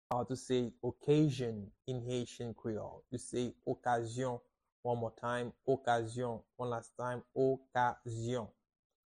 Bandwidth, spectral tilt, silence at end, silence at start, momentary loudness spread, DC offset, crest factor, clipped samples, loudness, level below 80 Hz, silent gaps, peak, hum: 11 kHz; -6.5 dB/octave; 0.65 s; 0.1 s; 10 LU; under 0.1%; 18 dB; under 0.1%; -38 LUFS; -68 dBFS; 4.72-4.83 s; -20 dBFS; none